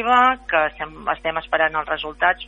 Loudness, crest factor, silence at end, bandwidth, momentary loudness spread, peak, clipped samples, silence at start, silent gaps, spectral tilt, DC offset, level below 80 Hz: -20 LUFS; 18 dB; 0 s; 7.6 kHz; 10 LU; -2 dBFS; under 0.1%; 0 s; none; -4.5 dB/octave; under 0.1%; -46 dBFS